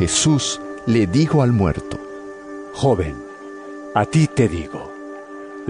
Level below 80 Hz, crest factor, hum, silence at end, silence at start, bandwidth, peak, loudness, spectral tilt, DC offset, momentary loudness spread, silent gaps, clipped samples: -42 dBFS; 16 dB; none; 0 s; 0 s; 10.5 kHz; -4 dBFS; -19 LUFS; -5 dB/octave; under 0.1%; 18 LU; none; under 0.1%